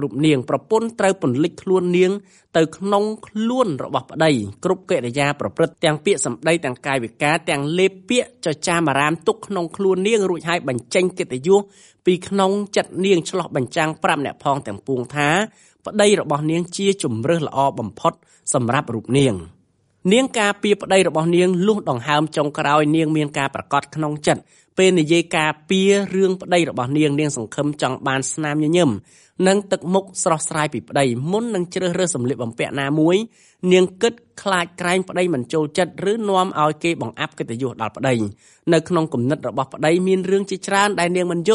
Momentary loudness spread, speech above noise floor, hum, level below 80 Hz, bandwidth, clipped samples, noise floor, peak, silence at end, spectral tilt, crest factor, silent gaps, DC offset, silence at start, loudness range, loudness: 7 LU; 19 dB; none; -60 dBFS; 11.5 kHz; under 0.1%; -38 dBFS; -2 dBFS; 0 s; -5 dB/octave; 18 dB; none; under 0.1%; 0 s; 3 LU; -19 LUFS